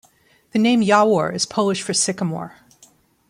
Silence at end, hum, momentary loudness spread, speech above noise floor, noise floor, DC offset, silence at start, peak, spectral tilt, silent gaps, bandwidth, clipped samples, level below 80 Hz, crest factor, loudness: 0.8 s; none; 11 LU; 39 dB; -57 dBFS; under 0.1%; 0.55 s; -2 dBFS; -4 dB/octave; none; 15 kHz; under 0.1%; -64 dBFS; 18 dB; -19 LUFS